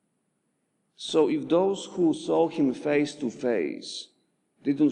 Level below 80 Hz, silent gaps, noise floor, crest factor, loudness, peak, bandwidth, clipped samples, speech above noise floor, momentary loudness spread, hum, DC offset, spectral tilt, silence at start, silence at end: -80 dBFS; none; -75 dBFS; 16 dB; -26 LUFS; -10 dBFS; 10 kHz; under 0.1%; 50 dB; 12 LU; none; under 0.1%; -5.5 dB/octave; 1 s; 0 s